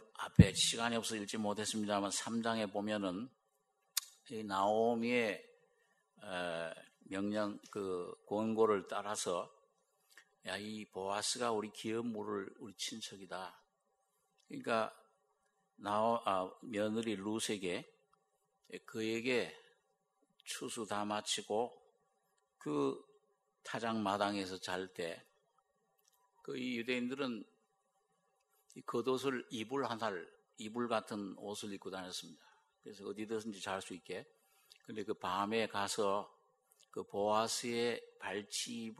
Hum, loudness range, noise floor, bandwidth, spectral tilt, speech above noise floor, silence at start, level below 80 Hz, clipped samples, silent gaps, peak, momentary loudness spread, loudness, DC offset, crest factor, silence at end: none; 6 LU; -81 dBFS; 13 kHz; -4.5 dB/octave; 43 dB; 0 s; -62 dBFS; under 0.1%; none; -10 dBFS; 14 LU; -38 LUFS; under 0.1%; 30 dB; 0.05 s